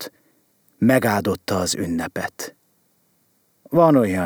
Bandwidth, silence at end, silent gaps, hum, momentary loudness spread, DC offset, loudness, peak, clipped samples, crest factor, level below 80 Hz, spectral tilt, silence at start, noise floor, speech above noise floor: over 20 kHz; 0 s; none; none; 16 LU; under 0.1%; -20 LUFS; -4 dBFS; under 0.1%; 18 dB; -60 dBFS; -5.5 dB/octave; 0 s; -63 dBFS; 44 dB